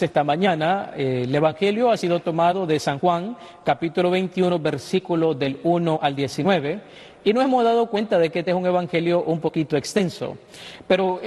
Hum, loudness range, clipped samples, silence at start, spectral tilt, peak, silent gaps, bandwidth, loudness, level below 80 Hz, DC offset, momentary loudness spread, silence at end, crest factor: none; 1 LU; under 0.1%; 0 s; -6 dB/octave; -4 dBFS; none; 12.5 kHz; -21 LUFS; -60 dBFS; under 0.1%; 6 LU; 0 s; 16 dB